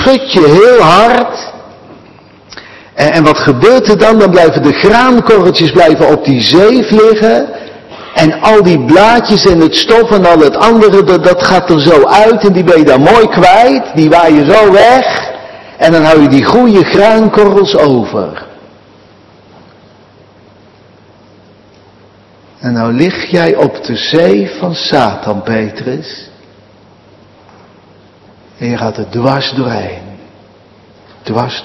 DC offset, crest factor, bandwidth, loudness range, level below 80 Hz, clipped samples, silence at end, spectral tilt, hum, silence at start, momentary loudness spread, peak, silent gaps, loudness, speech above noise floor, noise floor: under 0.1%; 8 dB; 12 kHz; 12 LU; -38 dBFS; 7%; 0 s; -6 dB/octave; none; 0 s; 13 LU; 0 dBFS; none; -6 LUFS; 35 dB; -41 dBFS